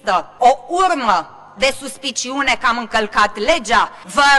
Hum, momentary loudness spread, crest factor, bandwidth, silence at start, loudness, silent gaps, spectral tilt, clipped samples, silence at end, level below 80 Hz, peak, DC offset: none; 6 LU; 16 dB; 12.5 kHz; 0.05 s; -17 LUFS; none; -1.5 dB/octave; under 0.1%; 0 s; -44 dBFS; 0 dBFS; under 0.1%